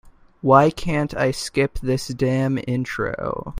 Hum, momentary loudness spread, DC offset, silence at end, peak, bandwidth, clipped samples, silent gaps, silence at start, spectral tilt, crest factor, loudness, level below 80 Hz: none; 10 LU; under 0.1%; 0 s; 0 dBFS; 15.5 kHz; under 0.1%; none; 0.05 s; -6 dB/octave; 20 dB; -21 LUFS; -42 dBFS